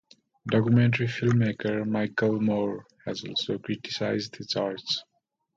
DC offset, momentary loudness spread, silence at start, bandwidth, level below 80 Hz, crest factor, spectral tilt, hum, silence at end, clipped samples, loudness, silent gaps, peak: under 0.1%; 10 LU; 0.45 s; 7.6 kHz; -64 dBFS; 18 dB; -6.5 dB/octave; none; 0.55 s; under 0.1%; -27 LUFS; none; -10 dBFS